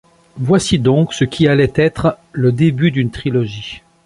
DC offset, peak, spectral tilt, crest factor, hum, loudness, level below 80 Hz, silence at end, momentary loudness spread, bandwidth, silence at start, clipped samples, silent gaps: under 0.1%; 0 dBFS; -6.5 dB/octave; 14 dB; none; -15 LUFS; -40 dBFS; 0.25 s; 8 LU; 11.5 kHz; 0.35 s; under 0.1%; none